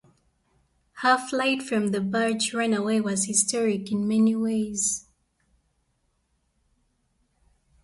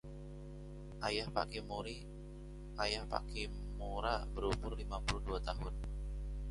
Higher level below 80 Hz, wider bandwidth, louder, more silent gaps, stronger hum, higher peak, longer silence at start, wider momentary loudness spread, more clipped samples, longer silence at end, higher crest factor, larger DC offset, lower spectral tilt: second, -66 dBFS vs -44 dBFS; about the same, 11.5 kHz vs 11.5 kHz; first, -24 LUFS vs -42 LUFS; neither; neither; first, -8 dBFS vs -18 dBFS; first, 0.95 s vs 0.05 s; second, 4 LU vs 13 LU; neither; first, 2.85 s vs 0 s; about the same, 20 dB vs 22 dB; neither; second, -3.5 dB/octave vs -5 dB/octave